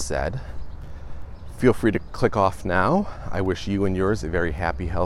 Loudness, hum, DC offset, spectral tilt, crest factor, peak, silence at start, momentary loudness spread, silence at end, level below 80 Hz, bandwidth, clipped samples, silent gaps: -23 LUFS; none; under 0.1%; -6.5 dB/octave; 18 dB; -4 dBFS; 0 s; 20 LU; 0 s; -36 dBFS; 13 kHz; under 0.1%; none